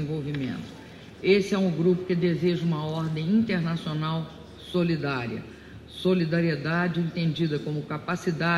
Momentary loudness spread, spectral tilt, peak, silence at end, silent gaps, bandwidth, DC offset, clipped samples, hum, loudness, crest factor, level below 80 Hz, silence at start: 14 LU; -7 dB/octave; -8 dBFS; 0 s; none; 11.5 kHz; under 0.1%; under 0.1%; none; -26 LUFS; 18 dB; -56 dBFS; 0 s